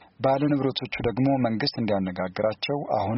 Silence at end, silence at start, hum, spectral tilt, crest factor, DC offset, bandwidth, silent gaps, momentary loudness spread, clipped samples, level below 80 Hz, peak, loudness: 0 s; 0.2 s; none; -5 dB/octave; 14 dB; under 0.1%; 6 kHz; none; 5 LU; under 0.1%; -54 dBFS; -10 dBFS; -25 LUFS